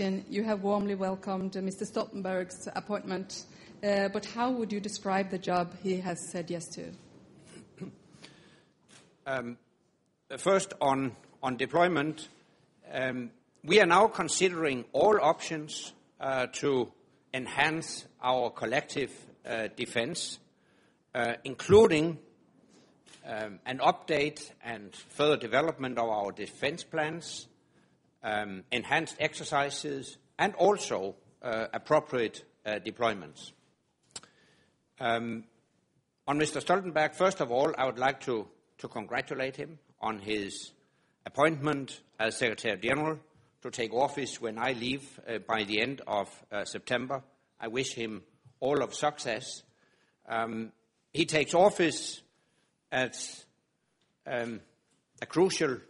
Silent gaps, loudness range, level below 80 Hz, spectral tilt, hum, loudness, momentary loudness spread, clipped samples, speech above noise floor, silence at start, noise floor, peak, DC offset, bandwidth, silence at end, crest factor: none; 8 LU; -68 dBFS; -4 dB/octave; none; -31 LUFS; 16 LU; under 0.1%; 46 dB; 0 s; -76 dBFS; -8 dBFS; under 0.1%; 11.5 kHz; 0.05 s; 24 dB